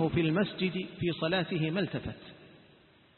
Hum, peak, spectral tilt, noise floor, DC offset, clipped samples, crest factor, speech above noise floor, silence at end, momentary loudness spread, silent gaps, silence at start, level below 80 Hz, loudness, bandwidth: none; -16 dBFS; -10.5 dB/octave; -61 dBFS; under 0.1%; under 0.1%; 18 dB; 30 dB; 0.6 s; 14 LU; none; 0 s; -58 dBFS; -31 LUFS; 4.4 kHz